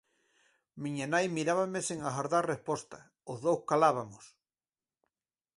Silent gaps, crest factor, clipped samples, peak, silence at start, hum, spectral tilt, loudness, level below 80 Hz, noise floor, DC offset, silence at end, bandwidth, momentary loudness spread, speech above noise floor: none; 22 dB; under 0.1%; -12 dBFS; 0.75 s; none; -5 dB/octave; -32 LUFS; -74 dBFS; under -90 dBFS; under 0.1%; 1.3 s; 11.5 kHz; 16 LU; over 58 dB